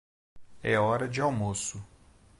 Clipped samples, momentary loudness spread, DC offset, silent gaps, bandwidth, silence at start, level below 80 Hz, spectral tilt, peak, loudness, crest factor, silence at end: under 0.1%; 10 LU; under 0.1%; none; 11.5 kHz; 0.35 s; -56 dBFS; -5 dB/octave; -12 dBFS; -29 LUFS; 18 dB; 0.55 s